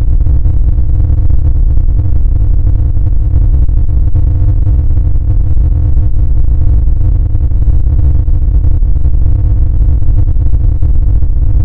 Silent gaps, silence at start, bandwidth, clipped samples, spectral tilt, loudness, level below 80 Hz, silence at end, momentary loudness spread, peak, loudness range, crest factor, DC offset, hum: none; 0 s; 1.6 kHz; under 0.1%; -12.5 dB/octave; -12 LUFS; -8 dBFS; 0 s; 2 LU; 0 dBFS; 0 LU; 6 dB; under 0.1%; none